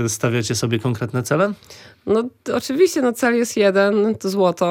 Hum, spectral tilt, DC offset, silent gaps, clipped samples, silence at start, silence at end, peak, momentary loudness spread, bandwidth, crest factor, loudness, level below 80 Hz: none; -5 dB/octave; under 0.1%; none; under 0.1%; 0 s; 0 s; -4 dBFS; 7 LU; 17 kHz; 14 dB; -19 LUFS; -58 dBFS